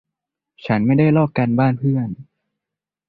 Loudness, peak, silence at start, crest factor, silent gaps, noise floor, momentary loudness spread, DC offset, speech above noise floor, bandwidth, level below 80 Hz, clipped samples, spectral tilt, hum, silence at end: -18 LUFS; -4 dBFS; 0.65 s; 14 dB; none; -86 dBFS; 15 LU; under 0.1%; 69 dB; 4.8 kHz; -52 dBFS; under 0.1%; -11 dB/octave; none; 0.85 s